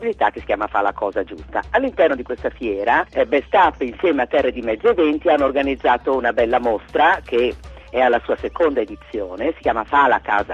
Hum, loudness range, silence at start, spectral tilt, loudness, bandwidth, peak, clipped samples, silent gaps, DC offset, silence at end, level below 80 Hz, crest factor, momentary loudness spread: none; 2 LU; 0 s; -6.5 dB/octave; -19 LUFS; 7.6 kHz; -2 dBFS; under 0.1%; none; under 0.1%; 0 s; -42 dBFS; 16 dB; 8 LU